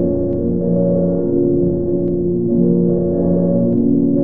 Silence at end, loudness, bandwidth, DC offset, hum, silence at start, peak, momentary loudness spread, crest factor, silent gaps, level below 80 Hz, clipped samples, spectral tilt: 0 s; -16 LUFS; 1.8 kHz; 3%; none; 0 s; -4 dBFS; 3 LU; 12 dB; none; -40 dBFS; under 0.1%; -15 dB/octave